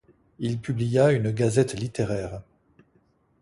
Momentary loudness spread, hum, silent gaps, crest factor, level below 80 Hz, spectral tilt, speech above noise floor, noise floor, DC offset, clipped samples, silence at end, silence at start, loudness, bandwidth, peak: 12 LU; none; none; 18 dB; -52 dBFS; -6.5 dB/octave; 41 dB; -65 dBFS; under 0.1%; under 0.1%; 1 s; 0.4 s; -25 LUFS; 11.5 kHz; -8 dBFS